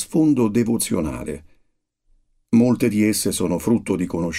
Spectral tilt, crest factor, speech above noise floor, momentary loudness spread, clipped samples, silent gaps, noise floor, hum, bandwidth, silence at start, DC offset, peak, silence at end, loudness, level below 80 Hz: -5.5 dB/octave; 16 dB; 46 dB; 10 LU; under 0.1%; none; -65 dBFS; none; 16 kHz; 0 s; under 0.1%; -6 dBFS; 0 s; -20 LUFS; -46 dBFS